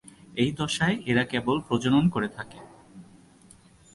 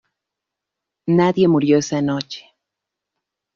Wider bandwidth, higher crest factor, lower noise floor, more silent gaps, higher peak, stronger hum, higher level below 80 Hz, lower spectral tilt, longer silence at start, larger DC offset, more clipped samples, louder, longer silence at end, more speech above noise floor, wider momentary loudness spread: first, 11.5 kHz vs 7.4 kHz; about the same, 16 dB vs 16 dB; second, -55 dBFS vs -83 dBFS; neither; second, -10 dBFS vs -4 dBFS; neither; first, -56 dBFS vs -62 dBFS; about the same, -5.5 dB/octave vs -6.5 dB/octave; second, 0.3 s vs 1.05 s; neither; neither; second, -26 LUFS vs -17 LUFS; second, 0.9 s vs 1.15 s; second, 29 dB vs 67 dB; second, 13 LU vs 16 LU